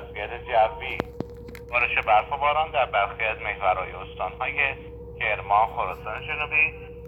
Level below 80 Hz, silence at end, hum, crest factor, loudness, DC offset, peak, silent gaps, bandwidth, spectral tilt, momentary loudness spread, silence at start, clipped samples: -44 dBFS; 0 s; none; 20 dB; -24 LUFS; under 0.1%; -6 dBFS; none; 13 kHz; -6 dB/octave; 12 LU; 0 s; under 0.1%